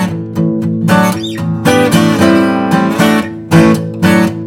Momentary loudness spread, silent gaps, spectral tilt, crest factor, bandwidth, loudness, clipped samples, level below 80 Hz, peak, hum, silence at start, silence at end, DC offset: 6 LU; none; -6 dB/octave; 10 dB; 16.5 kHz; -11 LUFS; 0.5%; -44 dBFS; 0 dBFS; none; 0 s; 0 s; under 0.1%